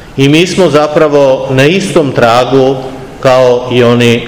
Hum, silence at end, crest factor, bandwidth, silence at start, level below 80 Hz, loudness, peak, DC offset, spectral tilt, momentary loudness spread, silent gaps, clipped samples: none; 0 s; 8 dB; 19 kHz; 0 s; -38 dBFS; -7 LUFS; 0 dBFS; 1%; -5.5 dB/octave; 4 LU; none; 6%